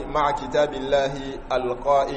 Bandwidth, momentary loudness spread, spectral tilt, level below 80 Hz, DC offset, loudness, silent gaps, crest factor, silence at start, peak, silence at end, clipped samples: 8.4 kHz; 6 LU; -5 dB/octave; -40 dBFS; under 0.1%; -24 LUFS; none; 14 dB; 0 s; -8 dBFS; 0 s; under 0.1%